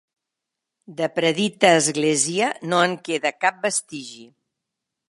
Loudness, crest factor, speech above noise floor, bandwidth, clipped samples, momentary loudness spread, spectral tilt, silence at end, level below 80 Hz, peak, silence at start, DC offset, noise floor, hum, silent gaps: -20 LUFS; 22 dB; 63 dB; 11.5 kHz; under 0.1%; 16 LU; -3 dB/octave; 0.85 s; -74 dBFS; 0 dBFS; 0.9 s; under 0.1%; -84 dBFS; none; none